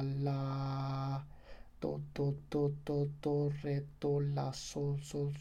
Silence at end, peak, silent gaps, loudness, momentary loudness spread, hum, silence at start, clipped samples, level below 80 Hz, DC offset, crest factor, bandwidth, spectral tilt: 0 s; -22 dBFS; none; -38 LUFS; 6 LU; none; 0 s; under 0.1%; -58 dBFS; under 0.1%; 14 dB; 9.8 kHz; -7.5 dB/octave